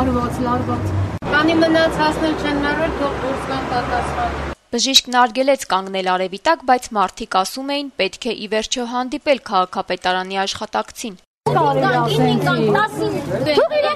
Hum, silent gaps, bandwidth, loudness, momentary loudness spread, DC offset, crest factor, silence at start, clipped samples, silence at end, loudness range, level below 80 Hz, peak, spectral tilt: none; 11.27-11.41 s; 13.5 kHz; -18 LUFS; 8 LU; under 0.1%; 18 dB; 0 s; under 0.1%; 0 s; 3 LU; -38 dBFS; 0 dBFS; -4.5 dB/octave